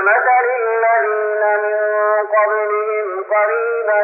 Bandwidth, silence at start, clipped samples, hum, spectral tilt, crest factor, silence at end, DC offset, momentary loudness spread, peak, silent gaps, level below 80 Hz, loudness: 2.9 kHz; 0 s; under 0.1%; none; -1 dB/octave; 12 dB; 0 s; under 0.1%; 4 LU; -4 dBFS; none; under -90 dBFS; -16 LUFS